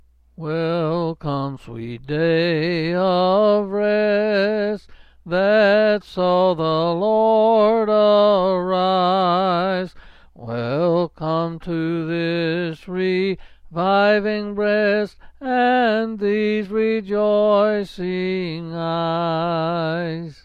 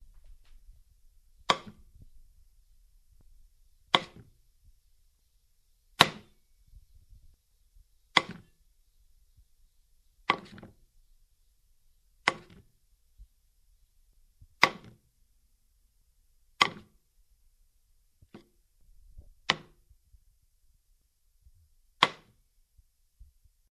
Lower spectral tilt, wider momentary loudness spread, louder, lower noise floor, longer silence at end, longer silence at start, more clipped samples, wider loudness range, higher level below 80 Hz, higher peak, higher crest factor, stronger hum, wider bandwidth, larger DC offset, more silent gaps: first, -8 dB/octave vs -2 dB/octave; second, 11 LU vs 27 LU; first, -19 LUFS vs -28 LUFS; second, -44 dBFS vs -69 dBFS; second, 0.1 s vs 1.55 s; second, 0.4 s vs 1.5 s; neither; second, 5 LU vs 8 LU; first, -52 dBFS vs -60 dBFS; second, -6 dBFS vs 0 dBFS; second, 12 dB vs 38 dB; neither; second, 7.2 kHz vs 13 kHz; neither; neither